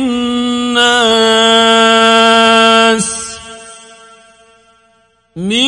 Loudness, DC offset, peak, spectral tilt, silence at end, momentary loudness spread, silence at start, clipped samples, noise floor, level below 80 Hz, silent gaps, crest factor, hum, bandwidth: -8 LUFS; under 0.1%; 0 dBFS; -2.5 dB/octave; 0 s; 15 LU; 0 s; 0.1%; -53 dBFS; -48 dBFS; none; 12 dB; none; 11.5 kHz